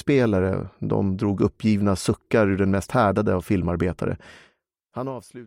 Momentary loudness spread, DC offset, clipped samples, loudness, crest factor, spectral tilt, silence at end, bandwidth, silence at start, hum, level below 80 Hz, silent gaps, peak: 12 LU; under 0.1%; under 0.1%; -23 LUFS; 18 dB; -7 dB/octave; 0 s; 16 kHz; 0.05 s; none; -46 dBFS; none; -6 dBFS